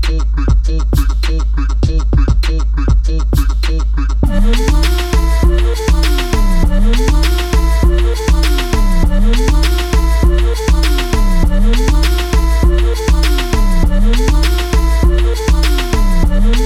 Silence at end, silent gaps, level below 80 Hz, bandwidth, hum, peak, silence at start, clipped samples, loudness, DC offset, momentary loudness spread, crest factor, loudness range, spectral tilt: 0 s; none; -10 dBFS; 14.5 kHz; none; -2 dBFS; 0 s; under 0.1%; -14 LUFS; under 0.1%; 3 LU; 10 dB; 1 LU; -5.5 dB/octave